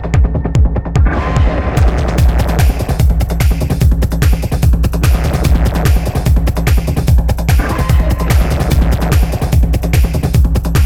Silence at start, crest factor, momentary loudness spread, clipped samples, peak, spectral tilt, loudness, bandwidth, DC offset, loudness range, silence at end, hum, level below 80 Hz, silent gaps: 0 s; 10 dB; 1 LU; under 0.1%; 0 dBFS; -6.5 dB/octave; -13 LUFS; 16.5 kHz; under 0.1%; 0 LU; 0 s; none; -12 dBFS; none